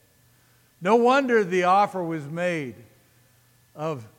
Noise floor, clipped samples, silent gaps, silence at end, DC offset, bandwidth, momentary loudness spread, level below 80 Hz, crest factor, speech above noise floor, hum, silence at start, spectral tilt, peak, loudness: -60 dBFS; under 0.1%; none; 0.1 s; under 0.1%; 16.5 kHz; 13 LU; -74 dBFS; 18 dB; 37 dB; none; 0.8 s; -6 dB/octave; -8 dBFS; -23 LUFS